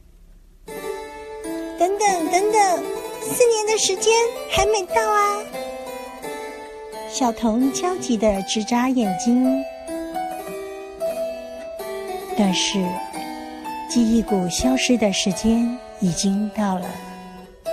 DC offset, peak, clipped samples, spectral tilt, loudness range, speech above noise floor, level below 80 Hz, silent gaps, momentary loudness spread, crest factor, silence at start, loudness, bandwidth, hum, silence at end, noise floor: under 0.1%; -4 dBFS; under 0.1%; -4 dB/octave; 6 LU; 28 dB; -46 dBFS; none; 15 LU; 18 dB; 0.2 s; -21 LUFS; 15 kHz; none; 0 s; -47 dBFS